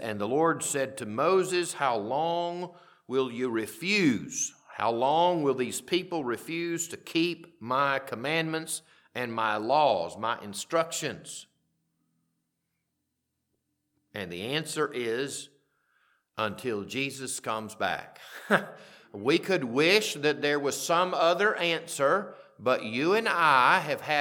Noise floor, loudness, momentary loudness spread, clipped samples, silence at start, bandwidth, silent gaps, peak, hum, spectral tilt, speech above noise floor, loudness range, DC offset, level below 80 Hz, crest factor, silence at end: -81 dBFS; -28 LUFS; 12 LU; under 0.1%; 0 s; 19 kHz; none; -6 dBFS; none; -3.5 dB/octave; 53 dB; 9 LU; under 0.1%; -78 dBFS; 24 dB; 0 s